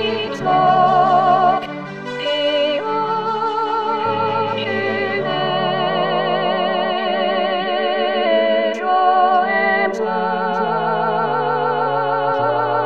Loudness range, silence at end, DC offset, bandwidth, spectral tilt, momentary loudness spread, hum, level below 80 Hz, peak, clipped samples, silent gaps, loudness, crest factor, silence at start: 3 LU; 0 s; 0.6%; 7.8 kHz; -6 dB/octave; 6 LU; none; -66 dBFS; -2 dBFS; under 0.1%; none; -17 LUFS; 14 dB; 0 s